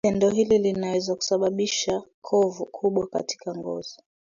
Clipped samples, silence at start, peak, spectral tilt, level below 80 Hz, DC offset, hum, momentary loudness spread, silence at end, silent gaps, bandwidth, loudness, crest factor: under 0.1%; 0.05 s; -10 dBFS; -4.5 dB/octave; -60 dBFS; under 0.1%; none; 11 LU; 0.35 s; 2.14-2.22 s; 7.4 kHz; -25 LUFS; 16 dB